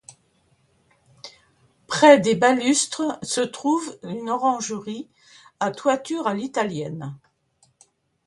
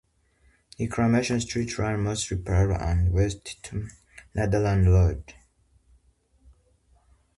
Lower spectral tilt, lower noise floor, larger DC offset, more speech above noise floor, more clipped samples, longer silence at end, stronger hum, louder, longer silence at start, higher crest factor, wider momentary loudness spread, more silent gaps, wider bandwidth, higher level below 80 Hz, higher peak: second, -3.5 dB/octave vs -6 dB/octave; about the same, -64 dBFS vs -63 dBFS; neither; about the same, 43 dB vs 40 dB; neither; second, 1.1 s vs 2.05 s; neither; first, -21 LUFS vs -25 LUFS; first, 1.25 s vs 0.8 s; first, 24 dB vs 18 dB; first, 21 LU vs 14 LU; neither; about the same, 11.5 kHz vs 11.5 kHz; second, -66 dBFS vs -34 dBFS; first, 0 dBFS vs -8 dBFS